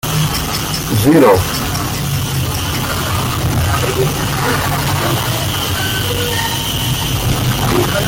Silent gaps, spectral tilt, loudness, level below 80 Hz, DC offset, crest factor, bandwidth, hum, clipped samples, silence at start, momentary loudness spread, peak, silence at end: none; -4.5 dB/octave; -15 LUFS; -30 dBFS; under 0.1%; 14 dB; 17 kHz; none; under 0.1%; 0.05 s; 6 LU; -2 dBFS; 0 s